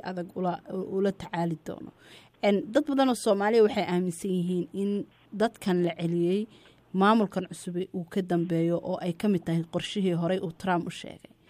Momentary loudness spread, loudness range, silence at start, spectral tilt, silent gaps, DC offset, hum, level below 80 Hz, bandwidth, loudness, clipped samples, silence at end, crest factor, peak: 12 LU; 3 LU; 0.05 s; -6.5 dB/octave; none; under 0.1%; none; -66 dBFS; 15 kHz; -28 LUFS; under 0.1%; 0.35 s; 18 dB; -10 dBFS